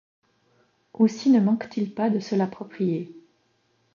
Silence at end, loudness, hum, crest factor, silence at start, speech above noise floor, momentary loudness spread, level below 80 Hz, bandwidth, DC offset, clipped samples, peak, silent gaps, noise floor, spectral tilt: 0.75 s; -24 LUFS; none; 18 dB; 1 s; 45 dB; 10 LU; -74 dBFS; 7.2 kHz; under 0.1%; under 0.1%; -8 dBFS; none; -68 dBFS; -7.5 dB/octave